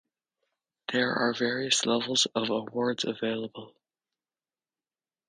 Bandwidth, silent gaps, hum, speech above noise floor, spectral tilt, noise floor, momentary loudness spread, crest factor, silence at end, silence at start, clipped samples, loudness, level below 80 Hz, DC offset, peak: 10.5 kHz; none; none; over 61 dB; -2.5 dB/octave; under -90 dBFS; 11 LU; 20 dB; 1.6 s; 0.9 s; under 0.1%; -28 LUFS; -76 dBFS; under 0.1%; -10 dBFS